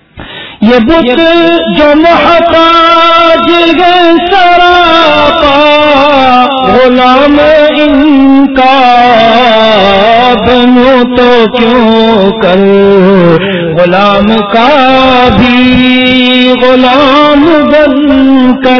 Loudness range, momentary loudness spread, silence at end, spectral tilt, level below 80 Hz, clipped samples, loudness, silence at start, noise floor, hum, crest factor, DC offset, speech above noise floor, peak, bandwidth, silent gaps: 1 LU; 3 LU; 0 s; -6.5 dB/octave; -30 dBFS; 10%; -4 LUFS; 0.15 s; -24 dBFS; none; 4 dB; under 0.1%; 20 dB; 0 dBFS; 5.4 kHz; none